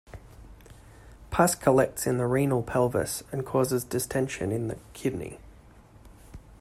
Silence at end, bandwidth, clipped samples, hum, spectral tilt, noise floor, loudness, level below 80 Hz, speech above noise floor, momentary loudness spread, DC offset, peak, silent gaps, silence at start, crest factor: 0.05 s; 16 kHz; under 0.1%; none; -5.5 dB/octave; -52 dBFS; -27 LUFS; -50 dBFS; 26 dB; 14 LU; under 0.1%; -8 dBFS; none; 0.1 s; 22 dB